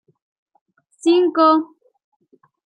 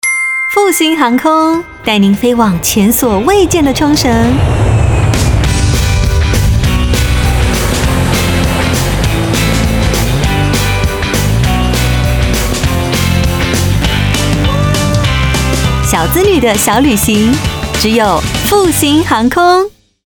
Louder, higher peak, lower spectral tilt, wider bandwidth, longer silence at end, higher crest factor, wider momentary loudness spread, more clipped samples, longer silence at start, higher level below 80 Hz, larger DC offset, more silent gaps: second, -16 LUFS vs -10 LUFS; about the same, -2 dBFS vs 0 dBFS; second, -3.5 dB/octave vs -5 dB/octave; second, 10.5 kHz vs over 20 kHz; first, 1.15 s vs 0.35 s; first, 18 dB vs 10 dB; first, 10 LU vs 3 LU; neither; first, 1.05 s vs 0.05 s; second, -78 dBFS vs -18 dBFS; neither; neither